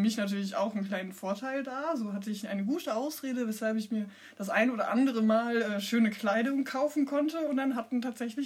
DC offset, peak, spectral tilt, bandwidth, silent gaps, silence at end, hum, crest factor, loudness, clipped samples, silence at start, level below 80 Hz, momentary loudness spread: under 0.1%; -14 dBFS; -5.5 dB/octave; 16 kHz; none; 0 s; none; 16 dB; -31 LUFS; under 0.1%; 0 s; -88 dBFS; 8 LU